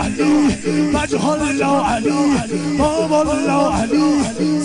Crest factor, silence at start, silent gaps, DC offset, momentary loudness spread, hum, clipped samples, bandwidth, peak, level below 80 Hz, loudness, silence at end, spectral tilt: 10 dB; 0 s; none; under 0.1%; 2 LU; none; under 0.1%; 10.5 kHz; -6 dBFS; -36 dBFS; -16 LUFS; 0 s; -5.5 dB/octave